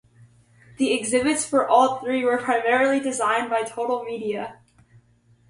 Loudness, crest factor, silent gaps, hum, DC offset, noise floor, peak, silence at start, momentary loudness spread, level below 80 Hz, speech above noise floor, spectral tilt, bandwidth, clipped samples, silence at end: -22 LUFS; 20 dB; none; none; under 0.1%; -58 dBFS; -4 dBFS; 0.8 s; 10 LU; -64 dBFS; 37 dB; -3 dB/octave; 11.5 kHz; under 0.1%; 0.95 s